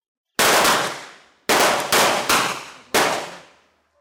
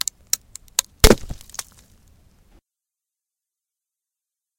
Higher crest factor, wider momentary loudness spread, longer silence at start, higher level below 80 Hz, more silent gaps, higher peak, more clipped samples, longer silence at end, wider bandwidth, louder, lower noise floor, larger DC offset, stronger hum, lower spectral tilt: second, 16 dB vs 24 dB; second, 15 LU vs 18 LU; second, 0.4 s vs 1.05 s; second, -56 dBFS vs -30 dBFS; neither; second, -6 dBFS vs 0 dBFS; neither; second, 0.6 s vs 3.3 s; about the same, 18 kHz vs 17 kHz; about the same, -18 LUFS vs -20 LUFS; second, -58 dBFS vs -87 dBFS; neither; neither; second, -1 dB/octave vs -3 dB/octave